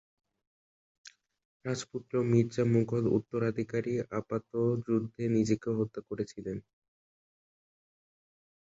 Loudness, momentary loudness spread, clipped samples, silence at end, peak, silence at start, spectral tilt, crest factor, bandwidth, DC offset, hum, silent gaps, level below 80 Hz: -32 LUFS; 10 LU; under 0.1%; 2.05 s; -14 dBFS; 1.05 s; -7.5 dB/octave; 20 dB; 8 kHz; under 0.1%; none; 1.45-1.60 s; -66 dBFS